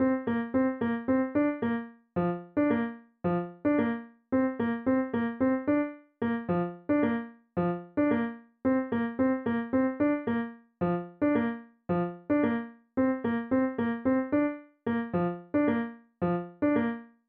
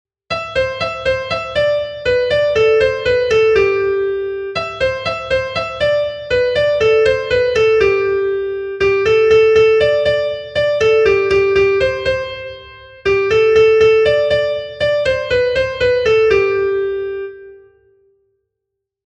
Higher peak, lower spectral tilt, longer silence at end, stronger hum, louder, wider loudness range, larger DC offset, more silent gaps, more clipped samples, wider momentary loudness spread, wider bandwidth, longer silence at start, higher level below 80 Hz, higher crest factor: second, -16 dBFS vs -2 dBFS; first, -7.5 dB/octave vs -5 dB/octave; second, 0.2 s vs 1.5 s; neither; second, -30 LUFS vs -15 LUFS; second, 1 LU vs 4 LU; neither; neither; neither; second, 7 LU vs 10 LU; second, 4.1 kHz vs 8.4 kHz; second, 0 s vs 0.3 s; second, -62 dBFS vs -40 dBFS; about the same, 14 dB vs 14 dB